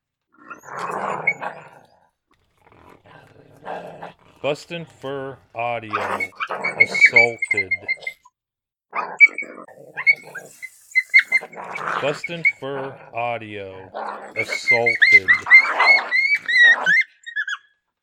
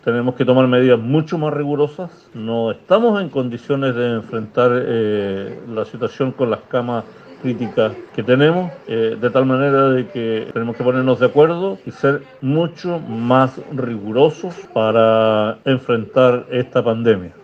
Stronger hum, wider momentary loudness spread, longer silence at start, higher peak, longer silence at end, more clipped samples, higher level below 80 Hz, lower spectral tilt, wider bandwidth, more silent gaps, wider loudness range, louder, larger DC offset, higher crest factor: neither; first, 22 LU vs 10 LU; first, 0.5 s vs 0.05 s; about the same, 0 dBFS vs 0 dBFS; first, 0.45 s vs 0.15 s; neither; second, -70 dBFS vs -58 dBFS; second, -2.5 dB/octave vs -8 dB/octave; first, 15 kHz vs 6.8 kHz; neither; first, 17 LU vs 3 LU; about the same, -16 LUFS vs -17 LUFS; neither; about the same, 20 dB vs 16 dB